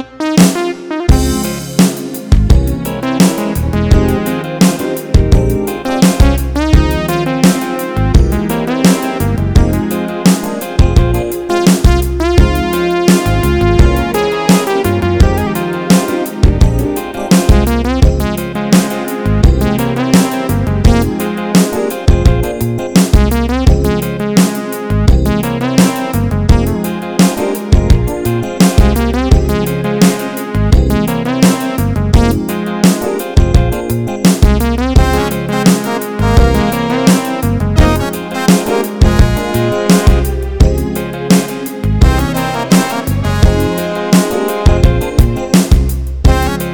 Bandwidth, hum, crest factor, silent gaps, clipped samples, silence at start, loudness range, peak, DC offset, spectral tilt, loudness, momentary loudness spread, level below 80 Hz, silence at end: over 20 kHz; none; 10 dB; none; 1%; 0 s; 1 LU; 0 dBFS; under 0.1%; -6 dB/octave; -12 LUFS; 6 LU; -16 dBFS; 0 s